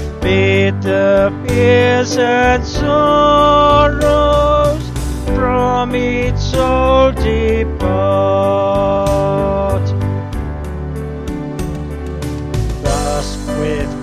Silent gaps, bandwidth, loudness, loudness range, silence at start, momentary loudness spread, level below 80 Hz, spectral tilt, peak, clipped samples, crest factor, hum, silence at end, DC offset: none; 14 kHz; -14 LUFS; 9 LU; 0 s; 12 LU; -24 dBFS; -6 dB/octave; 0 dBFS; under 0.1%; 14 dB; none; 0 s; under 0.1%